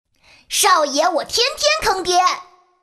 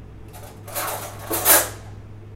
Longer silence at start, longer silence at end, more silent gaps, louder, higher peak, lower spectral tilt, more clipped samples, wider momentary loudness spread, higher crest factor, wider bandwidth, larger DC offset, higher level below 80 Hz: first, 0.5 s vs 0 s; first, 0.4 s vs 0 s; neither; first, -16 LUFS vs -19 LUFS; about the same, -2 dBFS vs 0 dBFS; second, 0 dB/octave vs -1.5 dB/octave; neither; second, 5 LU vs 26 LU; second, 16 dB vs 24 dB; second, 14 kHz vs 16.5 kHz; neither; about the same, -48 dBFS vs -46 dBFS